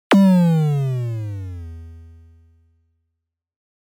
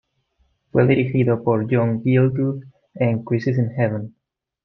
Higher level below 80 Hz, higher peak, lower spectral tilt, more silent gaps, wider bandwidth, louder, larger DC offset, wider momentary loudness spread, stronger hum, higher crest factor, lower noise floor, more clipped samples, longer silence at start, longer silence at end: about the same, -52 dBFS vs -56 dBFS; about the same, -6 dBFS vs -4 dBFS; second, -8 dB/octave vs -10.5 dB/octave; neither; first, 15 kHz vs 5.8 kHz; about the same, -18 LUFS vs -20 LUFS; neither; first, 22 LU vs 7 LU; neither; about the same, 14 dB vs 16 dB; first, -79 dBFS vs -65 dBFS; neither; second, 0.1 s vs 0.75 s; first, 1.85 s vs 0.55 s